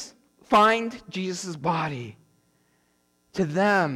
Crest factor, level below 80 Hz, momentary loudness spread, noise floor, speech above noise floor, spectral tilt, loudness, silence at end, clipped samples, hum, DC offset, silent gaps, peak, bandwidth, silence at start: 16 dB; -64 dBFS; 18 LU; -68 dBFS; 44 dB; -5 dB/octave; -24 LUFS; 0 s; under 0.1%; none; under 0.1%; none; -10 dBFS; 17 kHz; 0 s